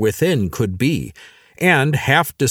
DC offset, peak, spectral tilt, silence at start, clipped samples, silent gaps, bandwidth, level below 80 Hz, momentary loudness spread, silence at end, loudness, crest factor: under 0.1%; 0 dBFS; -5 dB/octave; 0 s; under 0.1%; none; over 20 kHz; -46 dBFS; 7 LU; 0 s; -17 LUFS; 18 dB